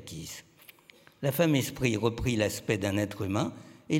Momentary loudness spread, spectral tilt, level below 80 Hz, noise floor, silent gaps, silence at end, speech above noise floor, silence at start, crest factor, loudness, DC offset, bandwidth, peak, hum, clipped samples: 15 LU; -5.5 dB/octave; -52 dBFS; -58 dBFS; none; 0 s; 29 dB; 0 s; 20 dB; -29 LUFS; under 0.1%; 17 kHz; -12 dBFS; none; under 0.1%